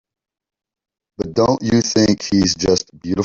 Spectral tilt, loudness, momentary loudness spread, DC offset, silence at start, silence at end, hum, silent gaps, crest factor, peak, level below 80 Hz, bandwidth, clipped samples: -4.5 dB/octave; -17 LUFS; 8 LU; under 0.1%; 1.2 s; 0 s; none; none; 16 dB; -2 dBFS; -44 dBFS; 7.8 kHz; under 0.1%